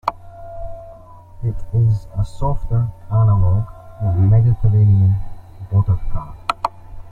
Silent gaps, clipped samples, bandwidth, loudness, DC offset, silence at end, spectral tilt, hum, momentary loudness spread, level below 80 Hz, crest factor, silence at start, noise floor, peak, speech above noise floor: none; under 0.1%; 4.7 kHz; -18 LUFS; under 0.1%; 0 s; -9 dB/octave; none; 20 LU; -30 dBFS; 16 dB; 0.05 s; -39 dBFS; 0 dBFS; 24 dB